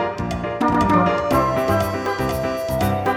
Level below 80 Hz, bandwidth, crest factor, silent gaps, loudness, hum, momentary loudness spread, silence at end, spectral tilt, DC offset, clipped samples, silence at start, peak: -38 dBFS; 17.5 kHz; 16 dB; none; -20 LUFS; none; 7 LU; 0 s; -6.5 dB/octave; under 0.1%; under 0.1%; 0 s; -4 dBFS